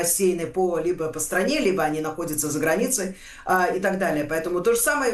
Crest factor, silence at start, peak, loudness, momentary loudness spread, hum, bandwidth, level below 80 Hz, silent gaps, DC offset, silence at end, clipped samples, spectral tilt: 14 dB; 0 s; -8 dBFS; -23 LUFS; 6 LU; none; 13 kHz; -50 dBFS; none; under 0.1%; 0 s; under 0.1%; -3.5 dB/octave